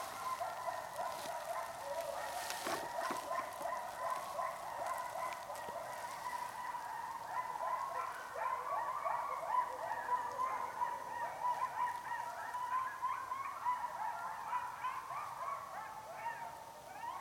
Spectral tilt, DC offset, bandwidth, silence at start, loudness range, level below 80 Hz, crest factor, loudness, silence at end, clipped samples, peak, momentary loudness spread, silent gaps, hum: -2 dB/octave; under 0.1%; 18 kHz; 0 s; 3 LU; -76 dBFS; 22 dB; -41 LUFS; 0 s; under 0.1%; -20 dBFS; 6 LU; none; none